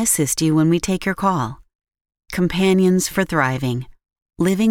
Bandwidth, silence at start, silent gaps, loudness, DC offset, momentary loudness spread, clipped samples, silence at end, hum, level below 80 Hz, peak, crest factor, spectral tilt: 17.5 kHz; 0 s; 1.75-1.79 s, 2.01-2.05 s, 4.22-4.26 s; -19 LUFS; under 0.1%; 9 LU; under 0.1%; 0 s; none; -44 dBFS; -4 dBFS; 16 dB; -5 dB/octave